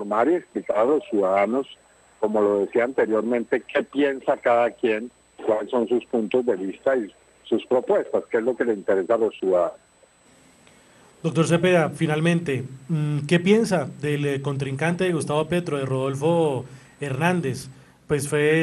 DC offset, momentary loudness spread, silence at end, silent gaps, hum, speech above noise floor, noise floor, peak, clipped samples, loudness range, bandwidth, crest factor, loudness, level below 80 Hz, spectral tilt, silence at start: under 0.1%; 8 LU; 0 s; none; none; 34 dB; -56 dBFS; -4 dBFS; under 0.1%; 2 LU; 12.5 kHz; 18 dB; -23 LUFS; -62 dBFS; -6.5 dB/octave; 0 s